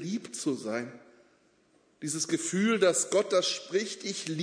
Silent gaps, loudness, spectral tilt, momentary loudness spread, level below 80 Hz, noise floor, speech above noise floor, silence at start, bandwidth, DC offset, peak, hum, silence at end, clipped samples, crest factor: none; -29 LUFS; -3.5 dB/octave; 11 LU; -80 dBFS; -66 dBFS; 37 dB; 0 s; 11 kHz; under 0.1%; -12 dBFS; none; 0 s; under 0.1%; 20 dB